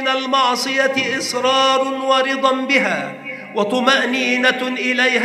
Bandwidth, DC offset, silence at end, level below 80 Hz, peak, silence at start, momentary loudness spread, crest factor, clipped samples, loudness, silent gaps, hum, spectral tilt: 14.5 kHz; under 0.1%; 0 s; -74 dBFS; 0 dBFS; 0 s; 6 LU; 18 dB; under 0.1%; -16 LUFS; none; none; -2.5 dB/octave